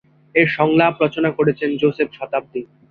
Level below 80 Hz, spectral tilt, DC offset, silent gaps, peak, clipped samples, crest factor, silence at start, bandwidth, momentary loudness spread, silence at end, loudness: -58 dBFS; -8.5 dB/octave; under 0.1%; none; -2 dBFS; under 0.1%; 16 dB; 0.35 s; 5.2 kHz; 10 LU; 0.25 s; -18 LUFS